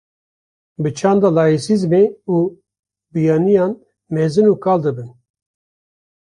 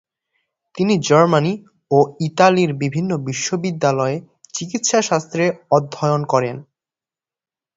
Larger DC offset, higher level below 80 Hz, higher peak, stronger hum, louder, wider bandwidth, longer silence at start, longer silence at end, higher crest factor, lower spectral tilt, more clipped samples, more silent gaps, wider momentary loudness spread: neither; about the same, -58 dBFS vs -60 dBFS; about the same, -2 dBFS vs 0 dBFS; neither; about the same, -16 LUFS vs -18 LUFS; first, 11 kHz vs 8 kHz; about the same, 0.8 s vs 0.75 s; about the same, 1.1 s vs 1.15 s; about the same, 16 dB vs 18 dB; first, -7.5 dB/octave vs -5 dB/octave; neither; first, 2.79-2.83 s vs none; about the same, 11 LU vs 13 LU